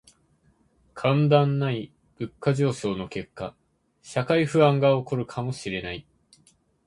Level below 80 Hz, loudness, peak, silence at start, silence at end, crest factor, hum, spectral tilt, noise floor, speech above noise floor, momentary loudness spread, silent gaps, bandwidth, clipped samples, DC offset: -58 dBFS; -24 LUFS; -4 dBFS; 0.95 s; 0.85 s; 20 dB; none; -7 dB/octave; -64 dBFS; 40 dB; 17 LU; none; 11 kHz; under 0.1%; under 0.1%